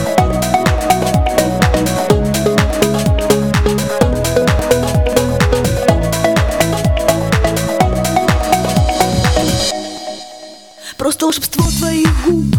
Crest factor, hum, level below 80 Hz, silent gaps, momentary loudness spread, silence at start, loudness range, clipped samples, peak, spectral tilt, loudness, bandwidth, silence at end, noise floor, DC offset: 14 dB; none; -22 dBFS; none; 3 LU; 0 s; 2 LU; under 0.1%; 0 dBFS; -5 dB/octave; -14 LUFS; 19 kHz; 0 s; -35 dBFS; 0.3%